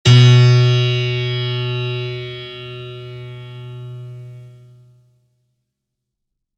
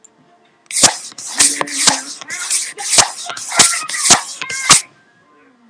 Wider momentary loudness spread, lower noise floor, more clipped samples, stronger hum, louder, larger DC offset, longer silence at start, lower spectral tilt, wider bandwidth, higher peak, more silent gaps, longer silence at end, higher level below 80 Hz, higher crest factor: first, 24 LU vs 13 LU; first, -79 dBFS vs -52 dBFS; second, under 0.1% vs 0.3%; neither; second, -15 LUFS vs -12 LUFS; neither; second, 0.05 s vs 0.7 s; first, -6 dB/octave vs 0.5 dB/octave; second, 7.8 kHz vs 11 kHz; about the same, 0 dBFS vs 0 dBFS; neither; first, 2.1 s vs 0.85 s; about the same, -50 dBFS vs -52 dBFS; about the same, 18 dB vs 16 dB